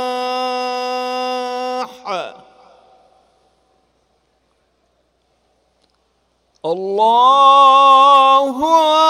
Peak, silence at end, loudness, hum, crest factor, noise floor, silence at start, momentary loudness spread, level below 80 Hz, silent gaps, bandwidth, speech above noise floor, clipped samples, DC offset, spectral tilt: 0 dBFS; 0 s; -13 LUFS; none; 16 dB; -63 dBFS; 0 s; 17 LU; -64 dBFS; none; 14.5 kHz; 53 dB; under 0.1%; under 0.1%; -2.5 dB/octave